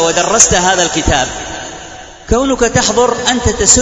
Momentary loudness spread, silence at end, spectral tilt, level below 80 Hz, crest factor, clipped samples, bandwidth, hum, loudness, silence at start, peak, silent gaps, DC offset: 18 LU; 0 s; -2.5 dB/octave; -26 dBFS; 12 dB; 0.3%; 11 kHz; none; -11 LUFS; 0 s; 0 dBFS; none; under 0.1%